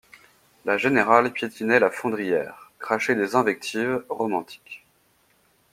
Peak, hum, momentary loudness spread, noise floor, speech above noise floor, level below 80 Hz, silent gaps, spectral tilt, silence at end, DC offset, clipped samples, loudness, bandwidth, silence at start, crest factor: 0 dBFS; none; 19 LU; -63 dBFS; 40 dB; -68 dBFS; none; -5 dB/octave; 0.95 s; under 0.1%; under 0.1%; -23 LUFS; 16 kHz; 0.65 s; 24 dB